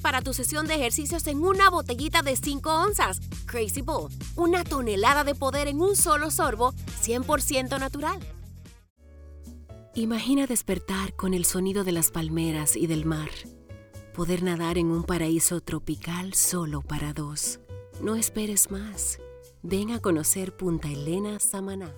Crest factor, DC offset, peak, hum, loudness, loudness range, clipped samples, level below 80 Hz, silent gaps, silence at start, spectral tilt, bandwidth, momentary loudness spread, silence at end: 20 dB; under 0.1%; -6 dBFS; none; -26 LUFS; 5 LU; under 0.1%; -42 dBFS; 8.90-8.96 s; 0 s; -3.5 dB/octave; over 20 kHz; 12 LU; 0 s